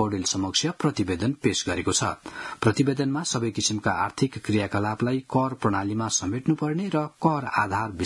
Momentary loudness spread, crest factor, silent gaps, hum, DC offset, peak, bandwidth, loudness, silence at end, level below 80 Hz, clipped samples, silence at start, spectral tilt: 3 LU; 20 dB; none; none; under 0.1%; -6 dBFS; 12 kHz; -25 LUFS; 0 s; -58 dBFS; under 0.1%; 0 s; -4.5 dB/octave